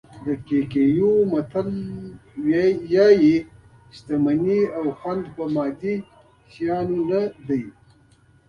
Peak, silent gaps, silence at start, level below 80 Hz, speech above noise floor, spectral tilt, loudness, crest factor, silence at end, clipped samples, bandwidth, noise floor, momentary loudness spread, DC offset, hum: -4 dBFS; none; 0.1 s; -56 dBFS; 35 dB; -8.5 dB/octave; -21 LUFS; 18 dB; 0.8 s; under 0.1%; 6.8 kHz; -55 dBFS; 12 LU; under 0.1%; none